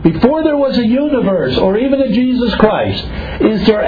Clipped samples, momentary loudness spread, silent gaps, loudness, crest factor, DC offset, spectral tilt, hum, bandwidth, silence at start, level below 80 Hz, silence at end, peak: 0.1%; 4 LU; none; -13 LUFS; 12 dB; under 0.1%; -8.5 dB/octave; none; 5 kHz; 0 s; -30 dBFS; 0 s; 0 dBFS